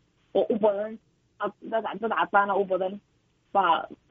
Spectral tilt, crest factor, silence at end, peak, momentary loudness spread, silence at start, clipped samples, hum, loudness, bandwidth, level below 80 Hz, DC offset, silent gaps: -3 dB/octave; 20 dB; 0.15 s; -8 dBFS; 11 LU; 0.35 s; under 0.1%; none; -27 LUFS; 4.7 kHz; -70 dBFS; under 0.1%; none